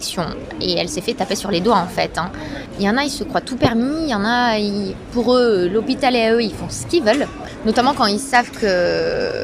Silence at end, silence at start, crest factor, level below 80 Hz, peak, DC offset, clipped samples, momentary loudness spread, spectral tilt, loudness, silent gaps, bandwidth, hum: 0 s; 0 s; 18 dB; -42 dBFS; 0 dBFS; under 0.1%; under 0.1%; 9 LU; -4.5 dB/octave; -18 LUFS; none; 15.5 kHz; none